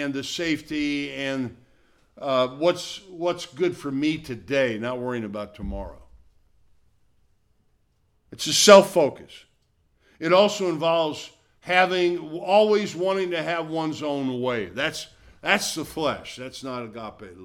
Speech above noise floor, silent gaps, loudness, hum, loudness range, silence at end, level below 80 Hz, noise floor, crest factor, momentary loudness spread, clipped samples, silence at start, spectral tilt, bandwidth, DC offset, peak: 43 dB; none; -23 LUFS; none; 11 LU; 0 s; -52 dBFS; -66 dBFS; 24 dB; 16 LU; under 0.1%; 0 s; -3.5 dB/octave; 17.5 kHz; under 0.1%; 0 dBFS